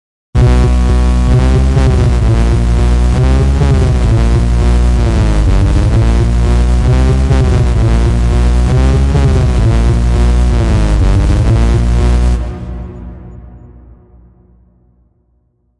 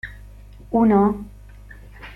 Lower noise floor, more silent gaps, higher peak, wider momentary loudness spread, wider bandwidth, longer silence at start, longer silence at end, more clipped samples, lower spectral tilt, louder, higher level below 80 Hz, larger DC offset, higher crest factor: first, -56 dBFS vs -42 dBFS; neither; first, -2 dBFS vs -6 dBFS; second, 1 LU vs 25 LU; first, 11 kHz vs 4.2 kHz; first, 0.35 s vs 0.05 s; first, 2.2 s vs 0 s; neither; second, -7.5 dB/octave vs -9.5 dB/octave; first, -11 LUFS vs -19 LUFS; first, -12 dBFS vs -42 dBFS; neither; second, 8 dB vs 16 dB